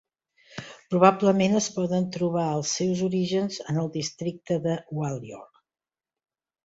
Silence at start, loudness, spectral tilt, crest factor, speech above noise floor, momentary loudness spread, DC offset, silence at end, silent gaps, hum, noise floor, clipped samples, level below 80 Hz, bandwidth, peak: 0.55 s; -25 LUFS; -5.5 dB/octave; 24 dB; over 65 dB; 20 LU; under 0.1%; 1.2 s; none; none; under -90 dBFS; under 0.1%; -64 dBFS; 8 kHz; -2 dBFS